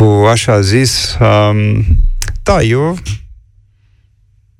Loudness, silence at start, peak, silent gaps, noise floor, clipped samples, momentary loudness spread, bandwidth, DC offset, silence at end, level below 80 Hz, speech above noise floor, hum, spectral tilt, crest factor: -11 LUFS; 0 s; 0 dBFS; none; -50 dBFS; under 0.1%; 10 LU; 14 kHz; under 0.1%; 1.25 s; -20 dBFS; 40 dB; none; -5.5 dB/octave; 12 dB